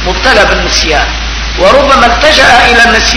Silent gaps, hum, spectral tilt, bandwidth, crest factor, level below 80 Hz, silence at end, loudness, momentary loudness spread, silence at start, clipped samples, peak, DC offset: none; none; -2.5 dB/octave; 11 kHz; 6 dB; -18 dBFS; 0 s; -5 LUFS; 8 LU; 0 s; 6%; 0 dBFS; under 0.1%